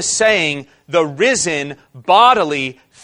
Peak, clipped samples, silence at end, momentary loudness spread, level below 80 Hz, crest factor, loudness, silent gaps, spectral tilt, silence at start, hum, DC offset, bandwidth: 0 dBFS; under 0.1%; 0.3 s; 15 LU; -54 dBFS; 16 dB; -14 LUFS; none; -2.5 dB/octave; 0 s; none; under 0.1%; 11.5 kHz